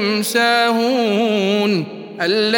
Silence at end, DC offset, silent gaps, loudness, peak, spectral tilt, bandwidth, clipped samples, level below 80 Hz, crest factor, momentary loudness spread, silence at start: 0 s; under 0.1%; none; -16 LUFS; -2 dBFS; -4 dB/octave; 17 kHz; under 0.1%; -74 dBFS; 14 dB; 7 LU; 0 s